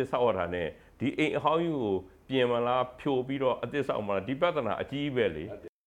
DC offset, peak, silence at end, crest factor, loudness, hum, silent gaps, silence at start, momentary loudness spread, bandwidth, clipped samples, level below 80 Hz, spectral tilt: under 0.1%; -12 dBFS; 0.2 s; 18 dB; -30 LUFS; none; none; 0 s; 7 LU; 11 kHz; under 0.1%; -60 dBFS; -7 dB/octave